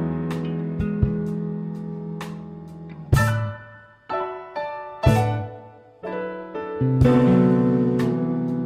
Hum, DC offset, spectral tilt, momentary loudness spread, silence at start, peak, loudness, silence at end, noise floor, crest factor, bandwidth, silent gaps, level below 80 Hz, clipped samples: none; under 0.1%; -8 dB/octave; 19 LU; 0 s; -4 dBFS; -23 LUFS; 0 s; -45 dBFS; 18 dB; 15 kHz; none; -38 dBFS; under 0.1%